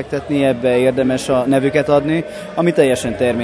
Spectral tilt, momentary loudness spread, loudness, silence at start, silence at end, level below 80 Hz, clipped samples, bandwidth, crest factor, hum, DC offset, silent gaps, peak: -6 dB/octave; 6 LU; -16 LUFS; 0 s; 0 s; -46 dBFS; under 0.1%; 11 kHz; 16 dB; none; under 0.1%; none; 0 dBFS